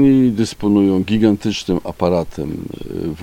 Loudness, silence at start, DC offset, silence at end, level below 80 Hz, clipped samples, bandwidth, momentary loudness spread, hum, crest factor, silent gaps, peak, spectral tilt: -17 LUFS; 0 s; under 0.1%; 0 s; -40 dBFS; under 0.1%; 15.5 kHz; 12 LU; none; 16 dB; none; 0 dBFS; -7 dB/octave